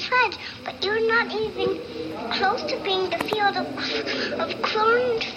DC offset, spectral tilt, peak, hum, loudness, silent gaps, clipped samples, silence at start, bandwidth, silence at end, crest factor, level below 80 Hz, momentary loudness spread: under 0.1%; -4 dB/octave; -6 dBFS; none; -24 LUFS; none; under 0.1%; 0 s; 14.5 kHz; 0 s; 18 dB; -58 dBFS; 8 LU